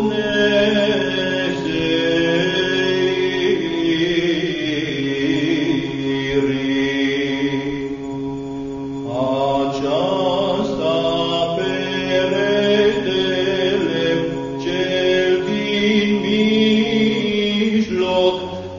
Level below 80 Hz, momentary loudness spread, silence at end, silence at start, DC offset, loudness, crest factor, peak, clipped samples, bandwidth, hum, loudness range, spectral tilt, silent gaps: -46 dBFS; 6 LU; 0 s; 0 s; under 0.1%; -18 LUFS; 14 dB; -4 dBFS; under 0.1%; 7.4 kHz; none; 4 LU; -5.5 dB/octave; none